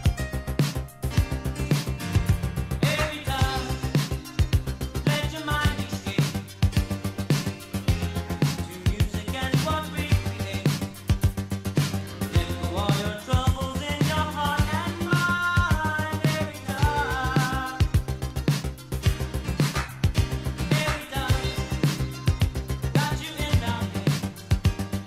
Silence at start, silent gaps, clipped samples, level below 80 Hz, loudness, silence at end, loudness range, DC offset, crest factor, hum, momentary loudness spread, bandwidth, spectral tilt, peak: 0 s; none; under 0.1%; -34 dBFS; -26 LUFS; 0 s; 2 LU; under 0.1%; 16 dB; none; 5 LU; 16 kHz; -5.5 dB/octave; -10 dBFS